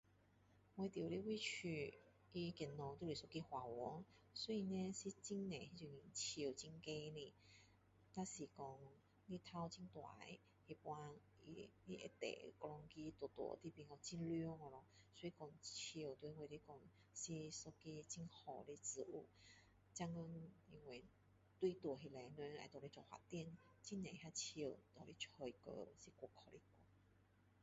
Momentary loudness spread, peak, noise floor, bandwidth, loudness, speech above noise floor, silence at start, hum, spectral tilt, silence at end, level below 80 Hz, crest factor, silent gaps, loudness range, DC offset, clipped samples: 14 LU; -32 dBFS; -75 dBFS; 8 kHz; -52 LUFS; 23 dB; 0.1 s; none; -4.5 dB/octave; 0 s; -78 dBFS; 20 dB; none; 6 LU; under 0.1%; under 0.1%